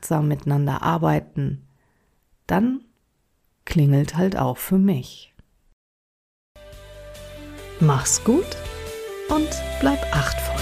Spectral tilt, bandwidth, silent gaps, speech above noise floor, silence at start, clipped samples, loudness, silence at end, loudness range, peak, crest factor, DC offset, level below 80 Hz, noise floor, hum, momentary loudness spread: -5.5 dB/octave; 15.5 kHz; 5.73-6.55 s; 47 dB; 0 s; under 0.1%; -22 LUFS; 0 s; 5 LU; -4 dBFS; 18 dB; under 0.1%; -38 dBFS; -67 dBFS; none; 20 LU